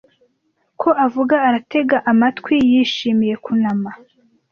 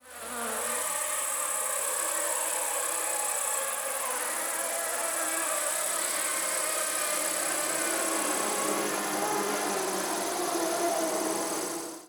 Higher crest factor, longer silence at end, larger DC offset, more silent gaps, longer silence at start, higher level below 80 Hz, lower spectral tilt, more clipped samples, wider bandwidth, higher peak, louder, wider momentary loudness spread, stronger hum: about the same, 14 dB vs 16 dB; first, 0.55 s vs 0 s; neither; neither; first, 0.8 s vs 0.05 s; first, -58 dBFS vs -70 dBFS; first, -6 dB/octave vs -0.5 dB/octave; neither; second, 6.8 kHz vs over 20 kHz; first, -2 dBFS vs -14 dBFS; first, -16 LUFS vs -28 LUFS; first, 6 LU vs 2 LU; neither